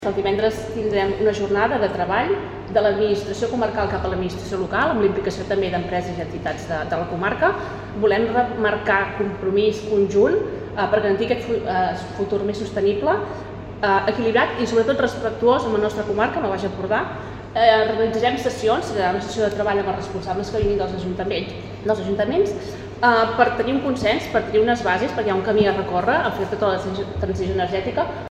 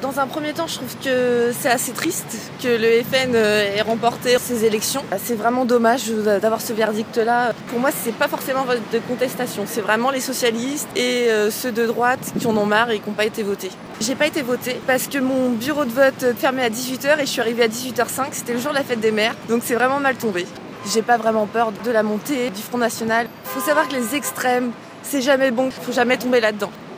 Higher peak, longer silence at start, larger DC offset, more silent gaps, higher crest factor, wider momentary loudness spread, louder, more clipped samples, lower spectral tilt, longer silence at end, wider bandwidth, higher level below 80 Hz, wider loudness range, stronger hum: about the same, -2 dBFS vs -2 dBFS; about the same, 0 s vs 0 s; neither; neither; about the same, 18 dB vs 18 dB; about the same, 8 LU vs 7 LU; about the same, -21 LUFS vs -20 LUFS; neither; first, -6 dB/octave vs -3.5 dB/octave; about the same, 0 s vs 0 s; second, 12 kHz vs 16 kHz; first, -44 dBFS vs -62 dBFS; about the same, 3 LU vs 2 LU; neither